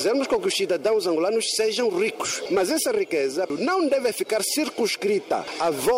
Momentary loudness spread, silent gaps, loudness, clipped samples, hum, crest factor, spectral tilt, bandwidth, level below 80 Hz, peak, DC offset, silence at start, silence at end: 3 LU; none; -23 LUFS; under 0.1%; none; 10 dB; -2.5 dB/octave; 16 kHz; -62 dBFS; -12 dBFS; under 0.1%; 0 s; 0 s